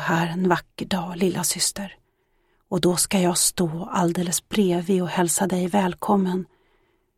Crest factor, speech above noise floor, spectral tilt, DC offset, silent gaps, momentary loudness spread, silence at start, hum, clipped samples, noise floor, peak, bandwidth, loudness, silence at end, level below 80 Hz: 20 dB; 44 dB; -4 dB/octave; under 0.1%; none; 8 LU; 0 s; none; under 0.1%; -67 dBFS; -4 dBFS; 16.5 kHz; -22 LUFS; 0.75 s; -54 dBFS